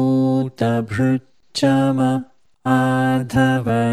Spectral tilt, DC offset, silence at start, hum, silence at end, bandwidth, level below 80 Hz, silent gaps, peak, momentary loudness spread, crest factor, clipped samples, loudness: -7 dB/octave; 0.2%; 0 s; none; 0 s; 13.5 kHz; -52 dBFS; none; -4 dBFS; 6 LU; 14 dB; under 0.1%; -19 LUFS